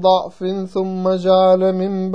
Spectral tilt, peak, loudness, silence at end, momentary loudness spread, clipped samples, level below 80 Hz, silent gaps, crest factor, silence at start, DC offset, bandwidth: -8 dB/octave; -2 dBFS; -17 LUFS; 0 s; 10 LU; under 0.1%; -58 dBFS; none; 14 dB; 0 s; 0.6%; 7.6 kHz